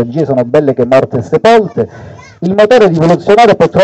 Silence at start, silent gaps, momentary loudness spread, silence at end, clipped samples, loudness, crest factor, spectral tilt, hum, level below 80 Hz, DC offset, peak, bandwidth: 0 s; none; 10 LU; 0 s; 1%; -9 LUFS; 8 dB; -7 dB/octave; none; -44 dBFS; under 0.1%; 0 dBFS; 9 kHz